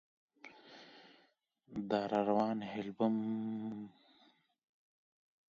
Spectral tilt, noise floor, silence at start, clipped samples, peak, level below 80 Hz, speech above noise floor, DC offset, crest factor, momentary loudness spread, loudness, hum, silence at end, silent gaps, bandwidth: -5.5 dB/octave; -74 dBFS; 0.45 s; under 0.1%; -18 dBFS; -80 dBFS; 38 dB; under 0.1%; 22 dB; 23 LU; -37 LUFS; none; 1.6 s; none; 7.2 kHz